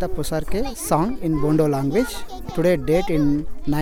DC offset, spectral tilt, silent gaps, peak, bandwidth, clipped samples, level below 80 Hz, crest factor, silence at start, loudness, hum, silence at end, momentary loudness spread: under 0.1%; -6.5 dB/octave; none; -6 dBFS; 18 kHz; under 0.1%; -32 dBFS; 14 dB; 0 s; -22 LUFS; none; 0 s; 8 LU